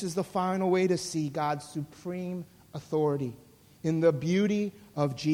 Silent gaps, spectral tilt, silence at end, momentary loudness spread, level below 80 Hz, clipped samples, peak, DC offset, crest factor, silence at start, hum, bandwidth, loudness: none; -6.5 dB/octave; 0 s; 12 LU; -66 dBFS; under 0.1%; -12 dBFS; under 0.1%; 18 dB; 0 s; none; 16.5 kHz; -30 LUFS